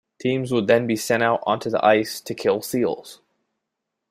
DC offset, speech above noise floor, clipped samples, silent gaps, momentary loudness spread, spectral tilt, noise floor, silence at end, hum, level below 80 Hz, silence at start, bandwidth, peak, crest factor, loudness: under 0.1%; 60 dB; under 0.1%; none; 7 LU; -5 dB/octave; -81 dBFS; 0.95 s; none; -64 dBFS; 0.2 s; 16 kHz; -4 dBFS; 18 dB; -21 LUFS